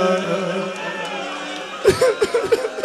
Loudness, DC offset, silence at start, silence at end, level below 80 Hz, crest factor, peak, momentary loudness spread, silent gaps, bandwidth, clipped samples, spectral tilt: -21 LUFS; under 0.1%; 0 s; 0 s; -50 dBFS; 18 dB; -2 dBFS; 10 LU; none; 15 kHz; under 0.1%; -4.5 dB/octave